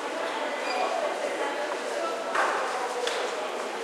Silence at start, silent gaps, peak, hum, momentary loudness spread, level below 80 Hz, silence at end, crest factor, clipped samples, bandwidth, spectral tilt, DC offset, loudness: 0 s; none; -12 dBFS; none; 4 LU; under -90 dBFS; 0 s; 16 dB; under 0.1%; 16 kHz; -1 dB/octave; under 0.1%; -29 LUFS